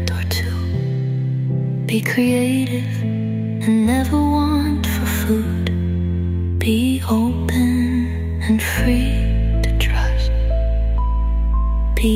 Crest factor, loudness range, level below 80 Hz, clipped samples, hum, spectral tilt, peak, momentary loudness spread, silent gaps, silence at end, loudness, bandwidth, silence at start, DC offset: 14 dB; 1 LU; -22 dBFS; under 0.1%; none; -6.5 dB/octave; -4 dBFS; 4 LU; none; 0 s; -19 LUFS; 16 kHz; 0 s; under 0.1%